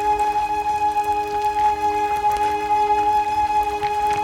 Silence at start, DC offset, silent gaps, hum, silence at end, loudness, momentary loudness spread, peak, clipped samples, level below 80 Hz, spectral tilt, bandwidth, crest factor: 0 s; under 0.1%; none; none; 0 s; -20 LUFS; 3 LU; -8 dBFS; under 0.1%; -44 dBFS; -3.5 dB/octave; 16.5 kHz; 12 dB